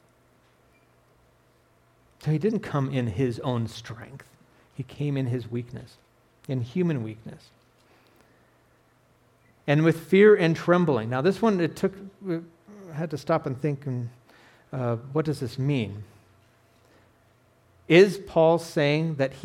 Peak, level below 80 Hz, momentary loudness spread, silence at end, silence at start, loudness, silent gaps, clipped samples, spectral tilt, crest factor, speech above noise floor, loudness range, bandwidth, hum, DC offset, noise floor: -6 dBFS; -64 dBFS; 21 LU; 0 s; 2.25 s; -25 LUFS; none; under 0.1%; -7 dB/octave; 20 dB; 38 dB; 11 LU; 14.5 kHz; none; under 0.1%; -62 dBFS